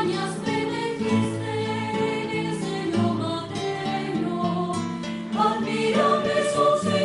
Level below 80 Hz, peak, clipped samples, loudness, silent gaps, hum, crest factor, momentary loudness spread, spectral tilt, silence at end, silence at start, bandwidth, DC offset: -60 dBFS; -8 dBFS; under 0.1%; -25 LUFS; none; none; 16 dB; 7 LU; -5.5 dB/octave; 0 s; 0 s; 11.5 kHz; under 0.1%